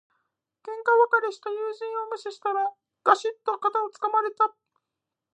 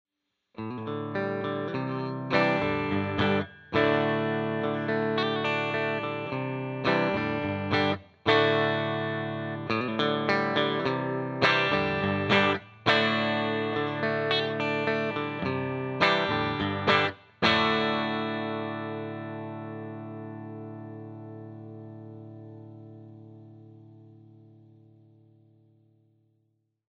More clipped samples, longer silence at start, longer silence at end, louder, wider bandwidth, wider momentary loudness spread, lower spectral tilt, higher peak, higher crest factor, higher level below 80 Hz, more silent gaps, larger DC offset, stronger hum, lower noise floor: neither; about the same, 0.65 s vs 0.6 s; second, 0.85 s vs 2.8 s; about the same, -26 LUFS vs -27 LUFS; first, 9.6 kHz vs 8.2 kHz; second, 11 LU vs 18 LU; second, -2 dB/octave vs -6.5 dB/octave; about the same, -6 dBFS vs -6 dBFS; about the same, 22 dB vs 22 dB; second, under -90 dBFS vs -62 dBFS; neither; neither; neither; first, -86 dBFS vs -74 dBFS